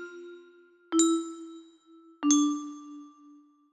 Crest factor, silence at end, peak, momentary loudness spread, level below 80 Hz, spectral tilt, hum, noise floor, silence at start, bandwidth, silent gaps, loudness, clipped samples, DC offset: 20 dB; 0.65 s; -10 dBFS; 24 LU; -80 dBFS; -1 dB/octave; none; -57 dBFS; 0 s; 12.5 kHz; none; -27 LUFS; under 0.1%; under 0.1%